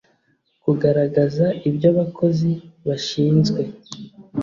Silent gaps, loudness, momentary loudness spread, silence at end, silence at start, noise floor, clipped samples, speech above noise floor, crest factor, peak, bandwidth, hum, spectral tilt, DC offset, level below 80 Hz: none; -20 LUFS; 13 LU; 0 s; 0.65 s; -65 dBFS; under 0.1%; 46 dB; 16 dB; -4 dBFS; 7.4 kHz; none; -7.5 dB/octave; under 0.1%; -56 dBFS